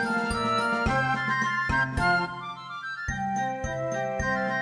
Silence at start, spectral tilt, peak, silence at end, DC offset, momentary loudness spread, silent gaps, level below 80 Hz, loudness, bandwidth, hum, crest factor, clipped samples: 0 s; -5 dB/octave; -12 dBFS; 0 s; under 0.1%; 9 LU; none; -42 dBFS; -27 LUFS; 10 kHz; none; 14 dB; under 0.1%